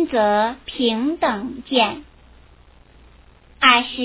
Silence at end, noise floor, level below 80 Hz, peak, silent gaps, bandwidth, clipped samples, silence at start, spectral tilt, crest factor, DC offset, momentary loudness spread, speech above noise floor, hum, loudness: 0 s; -49 dBFS; -50 dBFS; 0 dBFS; none; 4 kHz; under 0.1%; 0 s; -7.5 dB/octave; 20 dB; under 0.1%; 10 LU; 30 dB; none; -18 LUFS